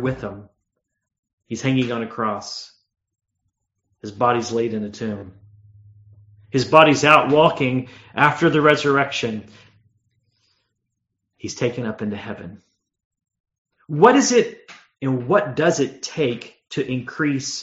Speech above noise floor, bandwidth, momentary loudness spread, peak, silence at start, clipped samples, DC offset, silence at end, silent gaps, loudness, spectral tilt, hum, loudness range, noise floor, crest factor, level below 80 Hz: 58 dB; 8 kHz; 20 LU; 0 dBFS; 0 s; under 0.1%; under 0.1%; 0 s; 1.19-1.23 s, 1.33-1.38 s, 13.05-13.11 s, 13.40-13.44 s, 13.58-13.65 s; -19 LUFS; -4 dB/octave; none; 15 LU; -78 dBFS; 22 dB; -58 dBFS